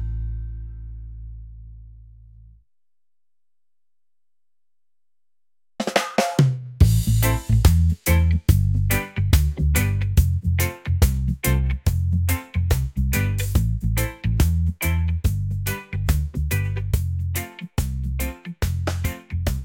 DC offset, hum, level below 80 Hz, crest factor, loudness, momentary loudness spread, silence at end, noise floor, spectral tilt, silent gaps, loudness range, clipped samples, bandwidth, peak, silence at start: under 0.1%; none; -28 dBFS; 18 dB; -22 LUFS; 11 LU; 0 s; under -90 dBFS; -5.5 dB/octave; none; 7 LU; under 0.1%; 17 kHz; -2 dBFS; 0 s